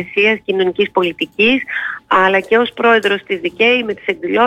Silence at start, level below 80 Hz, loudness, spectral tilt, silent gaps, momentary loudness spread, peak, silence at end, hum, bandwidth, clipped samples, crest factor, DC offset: 0 s; -54 dBFS; -14 LUFS; -5 dB/octave; none; 8 LU; -2 dBFS; 0 s; none; 11.5 kHz; under 0.1%; 12 dB; under 0.1%